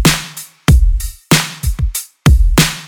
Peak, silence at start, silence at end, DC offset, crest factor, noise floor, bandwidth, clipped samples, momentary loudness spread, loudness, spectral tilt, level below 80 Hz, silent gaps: 0 dBFS; 0 s; 0 s; 0.4%; 12 dB; -30 dBFS; over 20 kHz; under 0.1%; 9 LU; -14 LUFS; -4 dB/octave; -14 dBFS; none